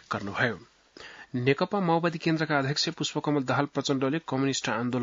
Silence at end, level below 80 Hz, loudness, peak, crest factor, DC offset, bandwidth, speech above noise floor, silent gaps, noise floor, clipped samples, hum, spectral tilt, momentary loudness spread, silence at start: 0 s; -68 dBFS; -28 LUFS; -10 dBFS; 18 dB; under 0.1%; 7.8 kHz; 21 dB; none; -48 dBFS; under 0.1%; none; -5 dB/octave; 9 LU; 0.1 s